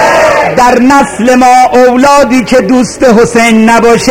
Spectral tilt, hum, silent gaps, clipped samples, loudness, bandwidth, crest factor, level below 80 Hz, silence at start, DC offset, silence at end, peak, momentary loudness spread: -4.5 dB/octave; none; none; 3%; -5 LUFS; 16.5 kHz; 4 dB; -32 dBFS; 0 s; 2%; 0 s; 0 dBFS; 3 LU